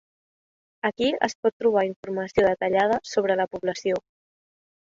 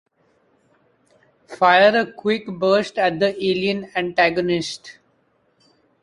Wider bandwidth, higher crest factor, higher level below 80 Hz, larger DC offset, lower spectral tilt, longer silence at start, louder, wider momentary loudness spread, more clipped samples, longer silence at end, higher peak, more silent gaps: second, 7.8 kHz vs 11 kHz; about the same, 22 dB vs 18 dB; about the same, -60 dBFS vs -62 dBFS; neither; about the same, -4.5 dB/octave vs -5 dB/octave; second, 0.85 s vs 1.5 s; second, -24 LUFS vs -19 LUFS; second, 7 LU vs 10 LU; neither; second, 0.95 s vs 1.1 s; about the same, -4 dBFS vs -2 dBFS; first, 1.35-1.43 s, 1.53-1.60 s, 1.96-2.03 s vs none